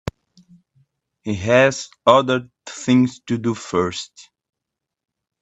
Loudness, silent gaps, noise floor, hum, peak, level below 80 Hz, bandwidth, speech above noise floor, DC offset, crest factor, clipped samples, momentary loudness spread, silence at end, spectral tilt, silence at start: -19 LUFS; none; -83 dBFS; none; 0 dBFS; -54 dBFS; 8.4 kHz; 65 dB; under 0.1%; 20 dB; under 0.1%; 18 LU; 1.2 s; -5 dB/octave; 0.05 s